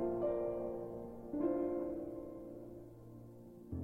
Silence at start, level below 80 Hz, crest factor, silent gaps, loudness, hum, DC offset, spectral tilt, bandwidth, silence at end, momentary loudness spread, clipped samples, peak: 0 s; -62 dBFS; 16 dB; none; -41 LUFS; none; under 0.1%; -10 dB/octave; 3.2 kHz; 0 s; 18 LU; under 0.1%; -26 dBFS